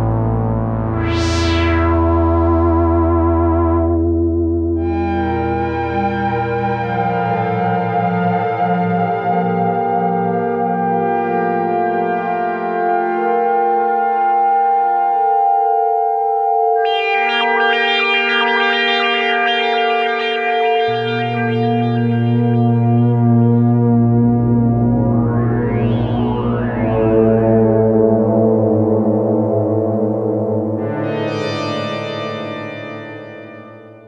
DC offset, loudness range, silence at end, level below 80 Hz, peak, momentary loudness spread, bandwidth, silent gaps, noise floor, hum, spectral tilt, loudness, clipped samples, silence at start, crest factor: under 0.1%; 4 LU; 0.1 s; -32 dBFS; 0 dBFS; 6 LU; 7.8 kHz; none; -37 dBFS; none; -7.5 dB/octave; -16 LUFS; under 0.1%; 0 s; 14 dB